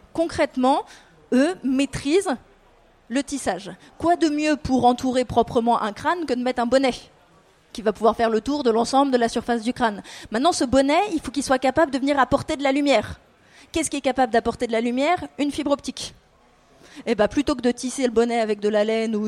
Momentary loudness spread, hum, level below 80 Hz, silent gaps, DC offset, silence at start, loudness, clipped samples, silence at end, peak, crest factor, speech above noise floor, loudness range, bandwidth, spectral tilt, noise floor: 8 LU; none; -48 dBFS; none; under 0.1%; 0.15 s; -22 LUFS; under 0.1%; 0 s; -4 dBFS; 18 dB; 35 dB; 3 LU; 13.5 kHz; -4.5 dB/octave; -56 dBFS